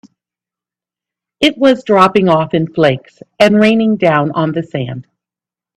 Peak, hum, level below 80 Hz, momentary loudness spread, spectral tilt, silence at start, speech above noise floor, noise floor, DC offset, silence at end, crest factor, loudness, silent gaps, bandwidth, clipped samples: 0 dBFS; none; -52 dBFS; 12 LU; -6.5 dB/octave; 1.4 s; 76 dB; -88 dBFS; under 0.1%; 0.75 s; 14 dB; -12 LUFS; none; 12 kHz; under 0.1%